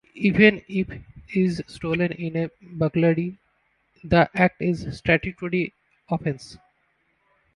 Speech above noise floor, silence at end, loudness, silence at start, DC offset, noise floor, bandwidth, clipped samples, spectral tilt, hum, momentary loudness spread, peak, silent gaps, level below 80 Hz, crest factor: 46 dB; 1 s; -23 LUFS; 0.15 s; under 0.1%; -68 dBFS; 11 kHz; under 0.1%; -7.5 dB/octave; none; 14 LU; -2 dBFS; none; -48 dBFS; 22 dB